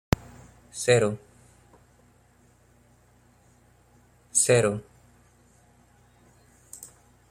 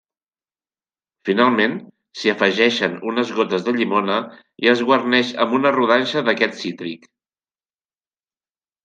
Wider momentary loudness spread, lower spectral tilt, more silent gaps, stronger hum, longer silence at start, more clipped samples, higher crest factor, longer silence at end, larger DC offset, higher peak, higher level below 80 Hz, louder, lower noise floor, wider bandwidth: first, 26 LU vs 14 LU; about the same, -4 dB/octave vs -5 dB/octave; neither; first, 60 Hz at -55 dBFS vs none; second, 0.75 s vs 1.25 s; neither; first, 26 dB vs 20 dB; second, 0.45 s vs 1.9 s; neither; second, -4 dBFS vs 0 dBFS; first, -50 dBFS vs -70 dBFS; second, -24 LUFS vs -18 LUFS; second, -60 dBFS vs under -90 dBFS; first, 16 kHz vs 9 kHz